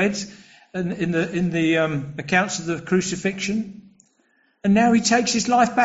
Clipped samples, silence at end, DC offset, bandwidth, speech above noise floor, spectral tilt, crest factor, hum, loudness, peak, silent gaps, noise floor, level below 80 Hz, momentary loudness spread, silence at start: under 0.1%; 0 s; under 0.1%; 8 kHz; 43 dB; -4.5 dB/octave; 16 dB; none; -21 LUFS; -4 dBFS; none; -64 dBFS; -56 dBFS; 12 LU; 0 s